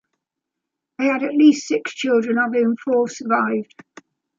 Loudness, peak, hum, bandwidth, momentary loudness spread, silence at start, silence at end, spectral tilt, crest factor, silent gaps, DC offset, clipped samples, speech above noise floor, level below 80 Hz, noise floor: -19 LUFS; -4 dBFS; none; 7.6 kHz; 8 LU; 1 s; 0.75 s; -4.5 dB/octave; 18 dB; none; under 0.1%; under 0.1%; 64 dB; -74 dBFS; -83 dBFS